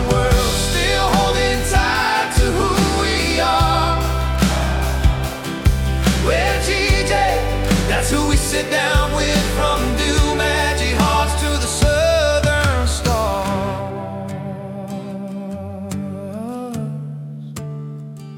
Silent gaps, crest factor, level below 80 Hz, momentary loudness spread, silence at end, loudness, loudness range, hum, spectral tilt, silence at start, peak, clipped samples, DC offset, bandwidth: none; 16 dB; -24 dBFS; 13 LU; 0 s; -18 LUFS; 11 LU; none; -4.5 dB/octave; 0 s; -2 dBFS; under 0.1%; under 0.1%; 18 kHz